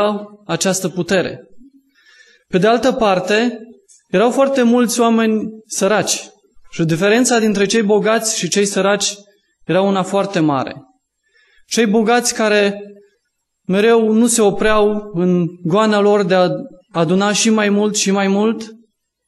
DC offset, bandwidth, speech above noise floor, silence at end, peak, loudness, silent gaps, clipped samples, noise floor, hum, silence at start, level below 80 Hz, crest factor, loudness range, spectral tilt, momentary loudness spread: under 0.1%; 12.5 kHz; 56 dB; 0.5 s; -2 dBFS; -15 LUFS; none; under 0.1%; -70 dBFS; none; 0 s; -46 dBFS; 14 dB; 3 LU; -4 dB/octave; 9 LU